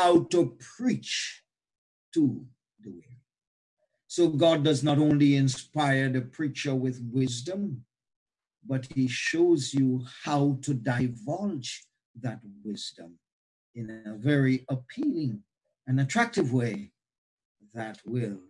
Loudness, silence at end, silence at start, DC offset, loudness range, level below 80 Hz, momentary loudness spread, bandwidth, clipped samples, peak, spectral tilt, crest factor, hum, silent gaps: -28 LUFS; 0.1 s; 0 s; under 0.1%; 8 LU; -70 dBFS; 17 LU; 11 kHz; under 0.1%; -10 dBFS; -6 dB/octave; 18 dB; none; 1.78-2.12 s, 3.47-3.77 s, 8.16-8.26 s, 12.05-12.14 s, 13.33-13.74 s, 17.18-17.38 s, 17.45-17.55 s